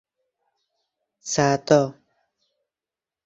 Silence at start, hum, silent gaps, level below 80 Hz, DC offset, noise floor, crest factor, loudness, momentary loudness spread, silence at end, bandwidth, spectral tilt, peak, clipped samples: 1.25 s; none; none; -62 dBFS; under 0.1%; under -90 dBFS; 22 dB; -21 LUFS; 12 LU; 1.35 s; 8 kHz; -5 dB/octave; -4 dBFS; under 0.1%